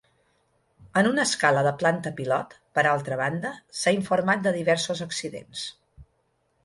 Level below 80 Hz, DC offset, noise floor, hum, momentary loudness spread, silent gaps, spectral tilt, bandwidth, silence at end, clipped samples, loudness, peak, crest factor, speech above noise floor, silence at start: -64 dBFS; under 0.1%; -70 dBFS; none; 12 LU; none; -4 dB/octave; 11.5 kHz; 0.6 s; under 0.1%; -25 LUFS; -6 dBFS; 20 dB; 46 dB; 0.8 s